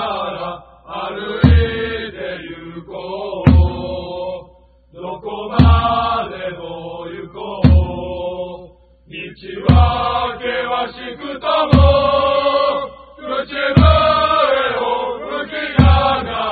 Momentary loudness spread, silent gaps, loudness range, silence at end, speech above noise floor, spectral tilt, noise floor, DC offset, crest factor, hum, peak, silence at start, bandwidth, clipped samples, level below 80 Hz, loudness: 18 LU; none; 6 LU; 0 s; 32 dB; -9.5 dB/octave; -47 dBFS; under 0.1%; 16 dB; none; 0 dBFS; 0 s; 4.8 kHz; under 0.1%; -22 dBFS; -16 LUFS